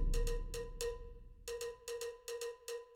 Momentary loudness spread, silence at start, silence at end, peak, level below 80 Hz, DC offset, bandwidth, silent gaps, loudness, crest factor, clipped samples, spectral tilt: 9 LU; 0 s; 0 s; -24 dBFS; -42 dBFS; under 0.1%; 17 kHz; none; -45 LUFS; 18 dB; under 0.1%; -3.5 dB/octave